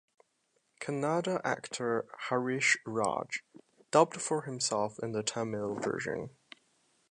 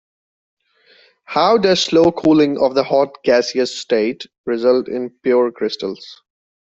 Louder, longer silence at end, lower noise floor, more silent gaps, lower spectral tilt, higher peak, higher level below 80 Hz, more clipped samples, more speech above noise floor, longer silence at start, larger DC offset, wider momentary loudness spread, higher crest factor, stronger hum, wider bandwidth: second, -32 LUFS vs -16 LUFS; first, 0.85 s vs 0.6 s; first, -76 dBFS vs -53 dBFS; second, none vs 4.38-4.44 s; about the same, -3.5 dB/octave vs -4.5 dB/octave; second, -10 dBFS vs -2 dBFS; second, -74 dBFS vs -56 dBFS; neither; first, 44 dB vs 37 dB; second, 0.8 s vs 1.3 s; neither; about the same, 10 LU vs 11 LU; first, 24 dB vs 14 dB; neither; first, 11 kHz vs 8 kHz